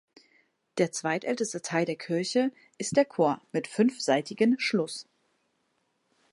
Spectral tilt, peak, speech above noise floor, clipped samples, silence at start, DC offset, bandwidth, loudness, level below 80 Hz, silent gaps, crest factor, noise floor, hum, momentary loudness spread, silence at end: -4.5 dB/octave; -10 dBFS; 47 dB; under 0.1%; 0.75 s; under 0.1%; 11.5 kHz; -28 LUFS; -78 dBFS; none; 20 dB; -75 dBFS; none; 8 LU; 1.3 s